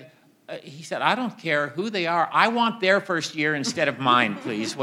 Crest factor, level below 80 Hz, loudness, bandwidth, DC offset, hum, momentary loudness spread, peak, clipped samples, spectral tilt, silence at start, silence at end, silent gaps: 20 dB; -78 dBFS; -23 LUFS; 15.5 kHz; under 0.1%; none; 13 LU; -4 dBFS; under 0.1%; -4 dB/octave; 0 s; 0 s; none